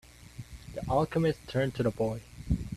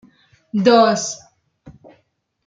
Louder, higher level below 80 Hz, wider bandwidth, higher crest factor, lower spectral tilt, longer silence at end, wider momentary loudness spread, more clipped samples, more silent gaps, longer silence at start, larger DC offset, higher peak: second, -31 LUFS vs -16 LUFS; first, -44 dBFS vs -62 dBFS; first, 14 kHz vs 9.4 kHz; about the same, 18 dB vs 18 dB; first, -7 dB/octave vs -4 dB/octave; second, 0 s vs 0.75 s; first, 18 LU vs 15 LU; neither; neither; second, 0.1 s vs 0.55 s; neither; second, -14 dBFS vs -2 dBFS